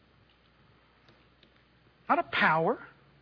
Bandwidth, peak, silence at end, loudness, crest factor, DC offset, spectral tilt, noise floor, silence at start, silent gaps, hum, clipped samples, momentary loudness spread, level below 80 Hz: 5.4 kHz; -12 dBFS; 0.35 s; -28 LUFS; 22 dB; under 0.1%; -7 dB/octave; -63 dBFS; 2.1 s; none; none; under 0.1%; 13 LU; -70 dBFS